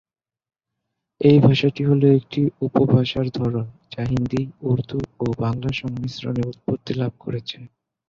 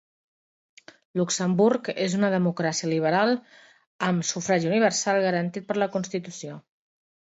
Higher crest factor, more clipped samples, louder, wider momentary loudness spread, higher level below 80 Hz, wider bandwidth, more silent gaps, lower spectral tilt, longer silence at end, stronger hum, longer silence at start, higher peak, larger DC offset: about the same, 18 dB vs 18 dB; neither; first, -21 LUFS vs -25 LUFS; about the same, 13 LU vs 11 LU; first, -48 dBFS vs -72 dBFS; second, 7 kHz vs 8 kHz; second, none vs 3.87-3.99 s; first, -8.5 dB/octave vs -4.5 dB/octave; second, 0.4 s vs 0.7 s; neither; about the same, 1.2 s vs 1.15 s; first, -2 dBFS vs -8 dBFS; neither